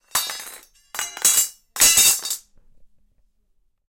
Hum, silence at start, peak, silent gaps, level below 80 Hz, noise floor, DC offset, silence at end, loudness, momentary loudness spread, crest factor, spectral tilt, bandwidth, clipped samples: none; 0.15 s; -2 dBFS; none; -56 dBFS; -64 dBFS; under 0.1%; 1.05 s; -16 LUFS; 20 LU; 20 dB; 2.5 dB/octave; 17 kHz; under 0.1%